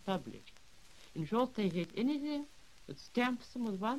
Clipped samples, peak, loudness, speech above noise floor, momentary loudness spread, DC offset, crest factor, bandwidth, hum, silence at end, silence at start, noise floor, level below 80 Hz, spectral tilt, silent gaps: under 0.1%; -18 dBFS; -37 LUFS; 24 dB; 16 LU; 0.1%; 20 dB; 14 kHz; none; 0 s; 0.05 s; -61 dBFS; -68 dBFS; -6.5 dB/octave; none